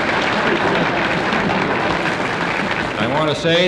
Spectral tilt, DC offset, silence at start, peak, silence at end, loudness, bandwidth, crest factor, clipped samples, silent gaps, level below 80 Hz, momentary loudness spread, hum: -5 dB/octave; under 0.1%; 0 s; -4 dBFS; 0 s; -18 LUFS; 12.5 kHz; 14 dB; under 0.1%; none; -44 dBFS; 3 LU; none